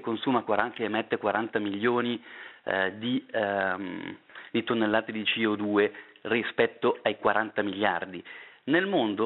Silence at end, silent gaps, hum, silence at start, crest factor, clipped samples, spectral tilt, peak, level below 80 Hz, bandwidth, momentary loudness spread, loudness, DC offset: 0 s; none; none; 0 s; 24 dB; under 0.1%; -2.5 dB/octave; -6 dBFS; -72 dBFS; 4.2 kHz; 13 LU; -28 LUFS; under 0.1%